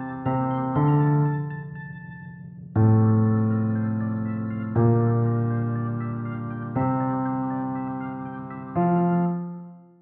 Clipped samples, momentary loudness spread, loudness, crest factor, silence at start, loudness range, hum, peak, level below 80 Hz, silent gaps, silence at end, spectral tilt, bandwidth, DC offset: under 0.1%; 16 LU; -24 LUFS; 16 dB; 0 s; 5 LU; none; -8 dBFS; -56 dBFS; none; 0.2 s; -13.5 dB/octave; 3.3 kHz; under 0.1%